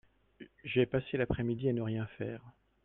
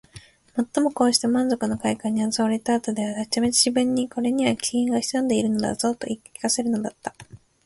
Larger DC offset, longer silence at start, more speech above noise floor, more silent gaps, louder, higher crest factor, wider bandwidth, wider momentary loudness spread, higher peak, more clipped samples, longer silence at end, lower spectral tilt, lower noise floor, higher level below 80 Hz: neither; first, 0.4 s vs 0.15 s; about the same, 23 dB vs 25 dB; neither; second, -34 LUFS vs -23 LUFS; about the same, 20 dB vs 20 dB; second, 4 kHz vs 12 kHz; about the same, 11 LU vs 9 LU; second, -16 dBFS vs -4 dBFS; neither; about the same, 0.35 s vs 0.3 s; first, -10.5 dB/octave vs -3.5 dB/octave; first, -57 dBFS vs -48 dBFS; about the same, -56 dBFS vs -58 dBFS